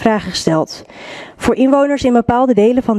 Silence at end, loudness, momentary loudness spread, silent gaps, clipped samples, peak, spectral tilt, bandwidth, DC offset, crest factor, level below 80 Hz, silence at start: 0 s; -14 LUFS; 19 LU; none; under 0.1%; 0 dBFS; -5.5 dB/octave; 12.5 kHz; under 0.1%; 14 dB; -42 dBFS; 0 s